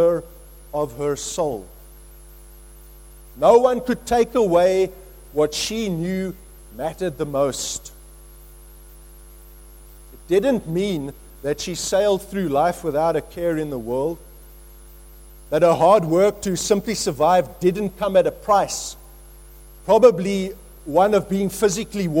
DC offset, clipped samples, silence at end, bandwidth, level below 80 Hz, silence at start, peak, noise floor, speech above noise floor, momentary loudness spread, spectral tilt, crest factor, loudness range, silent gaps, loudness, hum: under 0.1%; under 0.1%; 0 s; 16.5 kHz; -44 dBFS; 0 s; -2 dBFS; -43 dBFS; 24 dB; 14 LU; -5 dB/octave; 20 dB; 8 LU; none; -20 LUFS; none